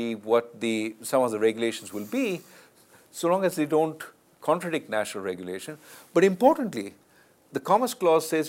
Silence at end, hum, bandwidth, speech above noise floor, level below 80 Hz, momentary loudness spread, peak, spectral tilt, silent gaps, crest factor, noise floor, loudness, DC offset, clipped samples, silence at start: 0 s; none; 16.5 kHz; 34 dB; -76 dBFS; 14 LU; -6 dBFS; -5 dB/octave; none; 22 dB; -59 dBFS; -26 LUFS; under 0.1%; under 0.1%; 0 s